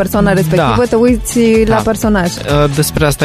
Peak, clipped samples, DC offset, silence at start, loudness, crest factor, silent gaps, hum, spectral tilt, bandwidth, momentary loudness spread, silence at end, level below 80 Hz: 0 dBFS; under 0.1%; under 0.1%; 0 s; -11 LUFS; 10 dB; none; none; -5.5 dB/octave; 15.5 kHz; 3 LU; 0 s; -26 dBFS